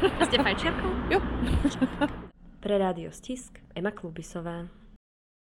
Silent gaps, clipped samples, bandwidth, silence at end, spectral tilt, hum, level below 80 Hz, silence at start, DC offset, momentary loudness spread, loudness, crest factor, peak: none; under 0.1%; 16 kHz; 0.45 s; -5.5 dB/octave; none; -40 dBFS; 0 s; under 0.1%; 16 LU; -29 LUFS; 20 dB; -8 dBFS